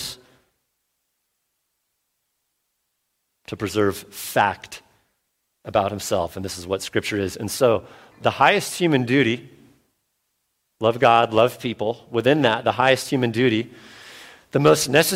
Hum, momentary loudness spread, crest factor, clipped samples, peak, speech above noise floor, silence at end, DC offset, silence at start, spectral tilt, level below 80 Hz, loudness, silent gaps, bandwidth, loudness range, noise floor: none; 15 LU; 22 dB; under 0.1%; -2 dBFS; 55 dB; 0 s; under 0.1%; 0 s; -4.5 dB/octave; -58 dBFS; -21 LUFS; none; 16.5 kHz; 7 LU; -75 dBFS